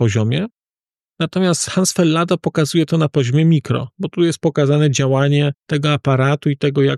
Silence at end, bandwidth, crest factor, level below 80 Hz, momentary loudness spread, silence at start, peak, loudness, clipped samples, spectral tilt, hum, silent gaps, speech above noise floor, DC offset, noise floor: 0 s; 13 kHz; 12 dB; -56 dBFS; 7 LU; 0 s; -4 dBFS; -17 LUFS; under 0.1%; -5.5 dB/octave; none; none; over 74 dB; under 0.1%; under -90 dBFS